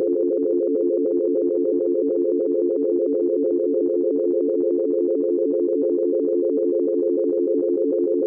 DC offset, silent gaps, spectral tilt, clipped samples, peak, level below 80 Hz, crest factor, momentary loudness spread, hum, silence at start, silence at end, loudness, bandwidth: under 0.1%; none; -13.5 dB/octave; under 0.1%; -14 dBFS; -70 dBFS; 6 dB; 0 LU; none; 0 s; 0 s; -21 LUFS; 1.5 kHz